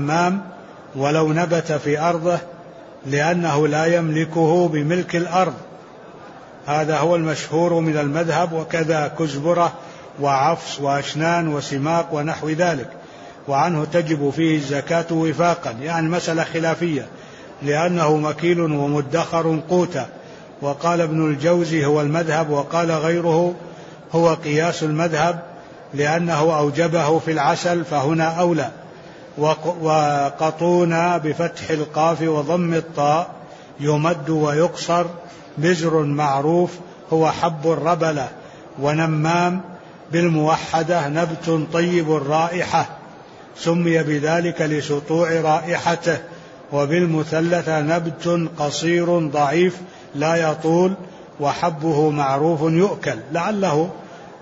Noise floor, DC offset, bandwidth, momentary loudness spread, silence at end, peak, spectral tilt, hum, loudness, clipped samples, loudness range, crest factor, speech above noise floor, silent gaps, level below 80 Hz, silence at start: -41 dBFS; under 0.1%; 8 kHz; 13 LU; 0 s; -4 dBFS; -6 dB/octave; none; -20 LUFS; under 0.1%; 2 LU; 14 dB; 22 dB; none; -60 dBFS; 0 s